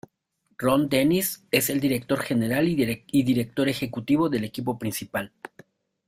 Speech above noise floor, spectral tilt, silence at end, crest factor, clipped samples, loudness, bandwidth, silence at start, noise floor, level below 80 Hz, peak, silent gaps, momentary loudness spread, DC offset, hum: 47 dB; -5 dB/octave; 0.8 s; 20 dB; under 0.1%; -24 LUFS; 16 kHz; 0.6 s; -71 dBFS; -58 dBFS; -6 dBFS; none; 9 LU; under 0.1%; none